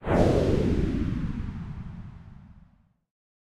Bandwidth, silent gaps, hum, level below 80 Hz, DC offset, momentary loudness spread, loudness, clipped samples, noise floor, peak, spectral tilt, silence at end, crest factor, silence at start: 12 kHz; none; none; -34 dBFS; under 0.1%; 21 LU; -27 LUFS; under 0.1%; -60 dBFS; -8 dBFS; -8 dB/octave; 0.85 s; 20 dB; 0 s